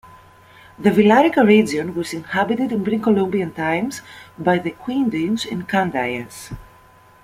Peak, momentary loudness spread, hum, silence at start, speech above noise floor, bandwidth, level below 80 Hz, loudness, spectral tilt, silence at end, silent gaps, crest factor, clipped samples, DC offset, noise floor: -2 dBFS; 14 LU; none; 0.8 s; 30 dB; 15.5 kHz; -52 dBFS; -19 LUFS; -6 dB/octave; 0.6 s; none; 18 dB; under 0.1%; under 0.1%; -49 dBFS